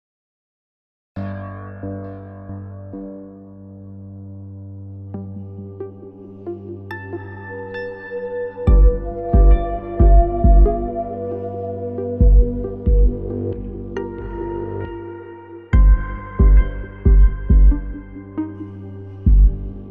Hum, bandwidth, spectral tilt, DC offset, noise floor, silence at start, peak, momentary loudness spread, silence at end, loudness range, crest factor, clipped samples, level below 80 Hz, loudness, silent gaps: none; 2.8 kHz; -11.5 dB/octave; under 0.1%; -38 dBFS; 1.15 s; -2 dBFS; 20 LU; 0 s; 17 LU; 16 dB; under 0.1%; -18 dBFS; -19 LUFS; none